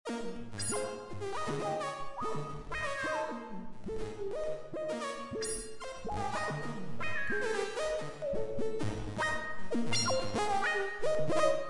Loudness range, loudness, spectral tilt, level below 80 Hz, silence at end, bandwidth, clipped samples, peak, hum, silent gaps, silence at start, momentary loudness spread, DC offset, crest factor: 5 LU; -36 LUFS; -4 dB/octave; -54 dBFS; 0 s; 11.5 kHz; under 0.1%; -16 dBFS; none; none; 0.05 s; 9 LU; under 0.1%; 18 dB